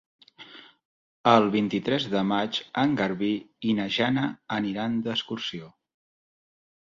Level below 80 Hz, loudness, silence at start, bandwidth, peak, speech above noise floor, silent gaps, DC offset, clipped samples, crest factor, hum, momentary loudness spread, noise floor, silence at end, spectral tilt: -66 dBFS; -26 LUFS; 0.4 s; 7.6 kHz; -4 dBFS; 23 dB; 0.85-1.24 s; under 0.1%; under 0.1%; 24 dB; none; 12 LU; -49 dBFS; 1.25 s; -6 dB/octave